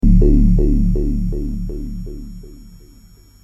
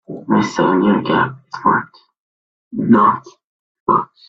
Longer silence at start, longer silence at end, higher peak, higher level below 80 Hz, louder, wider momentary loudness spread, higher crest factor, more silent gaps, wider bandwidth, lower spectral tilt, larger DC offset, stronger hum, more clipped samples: about the same, 0.05 s vs 0.1 s; first, 0.7 s vs 0.25 s; about the same, -2 dBFS vs 0 dBFS; first, -18 dBFS vs -56 dBFS; about the same, -18 LUFS vs -16 LUFS; first, 20 LU vs 13 LU; about the same, 14 dB vs 16 dB; second, none vs 2.20-2.71 s, 3.44-3.86 s; second, 5.8 kHz vs 7.6 kHz; first, -10.5 dB/octave vs -6.5 dB/octave; neither; first, 50 Hz at -45 dBFS vs none; neither